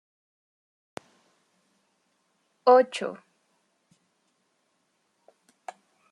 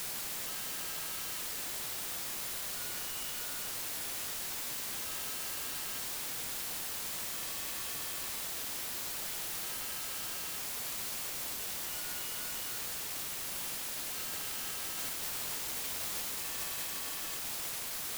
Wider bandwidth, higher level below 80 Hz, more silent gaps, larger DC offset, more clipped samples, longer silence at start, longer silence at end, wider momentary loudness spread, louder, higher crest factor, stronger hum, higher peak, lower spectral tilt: second, 11 kHz vs over 20 kHz; second, -88 dBFS vs -64 dBFS; neither; neither; neither; first, 2.65 s vs 0 s; first, 2.95 s vs 0 s; first, 26 LU vs 1 LU; first, -23 LUFS vs -36 LUFS; first, 24 dB vs 14 dB; neither; first, -8 dBFS vs -24 dBFS; first, -4 dB/octave vs 0 dB/octave